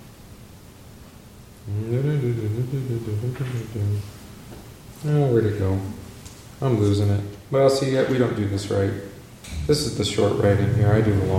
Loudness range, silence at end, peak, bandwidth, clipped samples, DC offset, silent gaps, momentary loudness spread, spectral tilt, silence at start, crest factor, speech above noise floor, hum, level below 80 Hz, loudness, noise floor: 5 LU; 0 s; -4 dBFS; 16 kHz; under 0.1%; under 0.1%; none; 21 LU; -6.5 dB/octave; 0 s; 18 dB; 23 dB; none; -44 dBFS; -23 LUFS; -44 dBFS